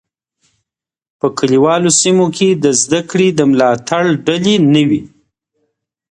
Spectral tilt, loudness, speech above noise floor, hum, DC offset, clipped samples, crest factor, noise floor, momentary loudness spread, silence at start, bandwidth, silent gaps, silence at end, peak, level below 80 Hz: -4.5 dB/octave; -12 LUFS; 69 dB; none; under 0.1%; under 0.1%; 14 dB; -80 dBFS; 6 LU; 1.25 s; 11 kHz; none; 1.05 s; 0 dBFS; -56 dBFS